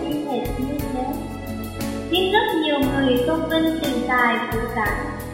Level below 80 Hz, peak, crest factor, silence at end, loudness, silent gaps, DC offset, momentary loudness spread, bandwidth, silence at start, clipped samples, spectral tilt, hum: -38 dBFS; -4 dBFS; 18 dB; 0 s; -22 LUFS; none; under 0.1%; 10 LU; 16.5 kHz; 0 s; under 0.1%; -5 dB/octave; none